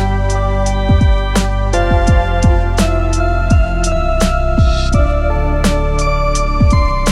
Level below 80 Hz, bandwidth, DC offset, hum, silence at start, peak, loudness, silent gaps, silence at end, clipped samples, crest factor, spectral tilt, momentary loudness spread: -14 dBFS; 12.5 kHz; under 0.1%; none; 0 s; 0 dBFS; -14 LUFS; none; 0 s; under 0.1%; 10 dB; -6 dB/octave; 3 LU